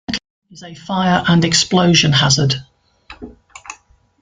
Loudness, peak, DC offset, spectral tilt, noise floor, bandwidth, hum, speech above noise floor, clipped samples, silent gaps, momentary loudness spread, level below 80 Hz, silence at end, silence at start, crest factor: -14 LUFS; 0 dBFS; under 0.1%; -4 dB/octave; -47 dBFS; 9.6 kHz; none; 33 dB; under 0.1%; 0.30-0.42 s; 25 LU; -46 dBFS; 0.45 s; 0.1 s; 16 dB